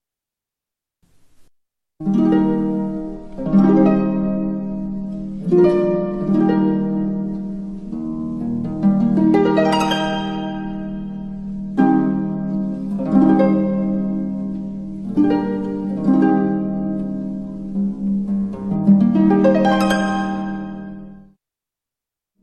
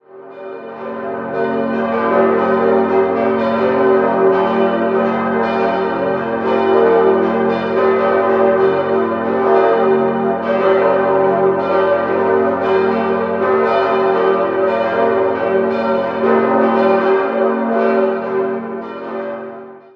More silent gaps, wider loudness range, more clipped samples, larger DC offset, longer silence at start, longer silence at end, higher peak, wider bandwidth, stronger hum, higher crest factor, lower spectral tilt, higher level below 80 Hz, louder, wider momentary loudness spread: neither; about the same, 3 LU vs 1 LU; neither; neither; first, 1.4 s vs 0.15 s; first, 1.2 s vs 0.15 s; about the same, -2 dBFS vs 0 dBFS; first, 9.6 kHz vs 5.6 kHz; neither; about the same, 16 dB vs 14 dB; about the same, -8 dB/octave vs -8.5 dB/octave; first, -44 dBFS vs -54 dBFS; second, -19 LUFS vs -15 LUFS; first, 14 LU vs 10 LU